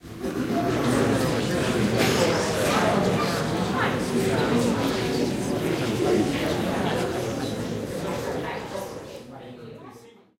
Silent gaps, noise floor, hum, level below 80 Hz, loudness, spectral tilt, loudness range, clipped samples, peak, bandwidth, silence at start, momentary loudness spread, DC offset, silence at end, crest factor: none; -48 dBFS; none; -48 dBFS; -25 LUFS; -5 dB/octave; 7 LU; under 0.1%; -6 dBFS; 16 kHz; 0.05 s; 13 LU; under 0.1%; 0.3 s; 18 dB